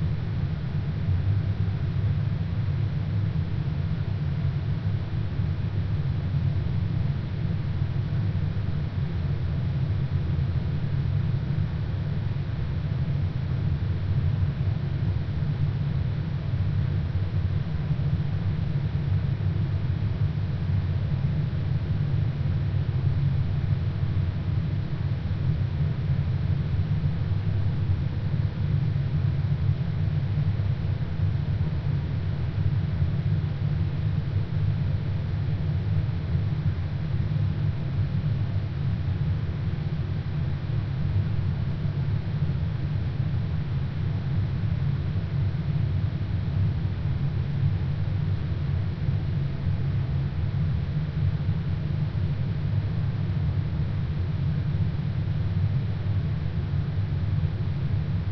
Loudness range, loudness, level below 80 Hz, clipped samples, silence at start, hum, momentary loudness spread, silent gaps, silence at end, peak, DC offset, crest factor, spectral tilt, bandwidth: 1 LU; -27 LUFS; -36 dBFS; under 0.1%; 0 s; none; 3 LU; none; 0 s; -12 dBFS; under 0.1%; 14 dB; -10 dB/octave; 5.8 kHz